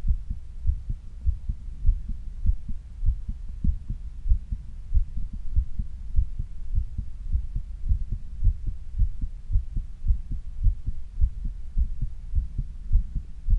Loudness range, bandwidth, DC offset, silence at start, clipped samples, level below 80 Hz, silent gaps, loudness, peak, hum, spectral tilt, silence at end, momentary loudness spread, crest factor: 1 LU; 0.7 kHz; under 0.1%; 0 s; under 0.1%; -26 dBFS; none; -32 LUFS; -8 dBFS; none; -9 dB/octave; 0 s; 8 LU; 18 dB